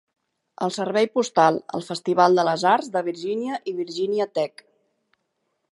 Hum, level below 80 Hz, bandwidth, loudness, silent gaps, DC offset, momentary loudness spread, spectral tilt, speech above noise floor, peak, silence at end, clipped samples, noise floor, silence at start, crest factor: none; -76 dBFS; 11.5 kHz; -22 LUFS; none; under 0.1%; 11 LU; -5 dB/octave; 53 dB; -4 dBFS; 1.25 s; under 0.1%; -75 dBFS; 0.6 s; 20 dB